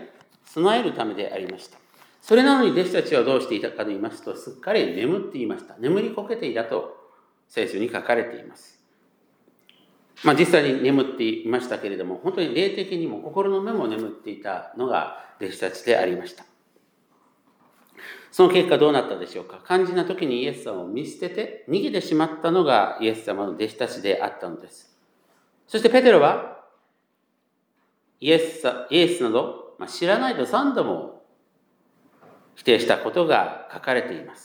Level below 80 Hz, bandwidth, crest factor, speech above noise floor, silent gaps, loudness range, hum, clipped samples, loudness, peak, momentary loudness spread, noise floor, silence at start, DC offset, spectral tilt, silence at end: -82 dBFS; 18 kHz; 22 dB; 49 dB; none; 6 LU; none; under 0.1%; -22 LUFS; -2 dBFS; 16 LU; -71 dBFS; 0 s; under 0.1%; -5 dB/octave; 0.1 s